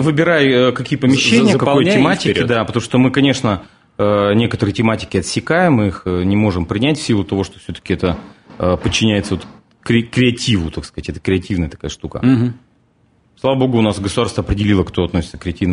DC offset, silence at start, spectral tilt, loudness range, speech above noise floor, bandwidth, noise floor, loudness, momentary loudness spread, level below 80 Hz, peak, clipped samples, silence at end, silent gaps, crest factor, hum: under 0.1%; 0 s; -5.5 dB/octave; 5 LU; 41 dB; 11 kHz; -56 dBFS; -16 LUFS; 11 LU; -38 dBFS; 0 dBFS; under 0.1%; 0 s; none; 16 dB; none